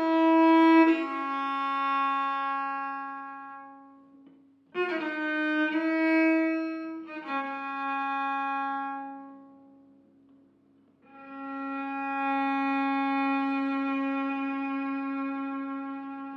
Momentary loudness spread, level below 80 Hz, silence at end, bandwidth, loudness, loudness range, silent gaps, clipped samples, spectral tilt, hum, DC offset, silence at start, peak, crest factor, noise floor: 16 LU; -86 dBFS; 0 s; 5.8 kHz; -28 LUFS; 8 LU; none; under 0.1%; -5 dB/octave; none; under 0.1%; 0 s; -10 dBFS; 18 dB; -63 dBFS